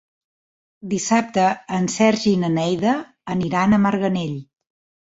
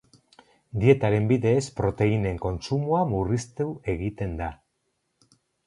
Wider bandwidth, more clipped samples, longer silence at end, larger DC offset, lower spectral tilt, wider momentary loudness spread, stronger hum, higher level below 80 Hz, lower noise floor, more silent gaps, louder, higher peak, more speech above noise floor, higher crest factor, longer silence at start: second, 8 kHz vs 11 kHz; neither; second, 0.6 s vs 1.15 s; neither; second, -5.5 dB/octave vs -7.5 dB/octave; about the same, 10 LU vs 10 LU; neither; second, -54 dBFS vs -44 dBFS; first, under -90 dBFS vs -75 dBFS; neither; first, -20 LUFS vs -25 LUFS; about the same, -4 dBFS vs -4 dBFS; first, over 71 dB vs 51 dB; about the same, 18 dB vs 20 dB; about the same, 0.85 s vs 0.75 s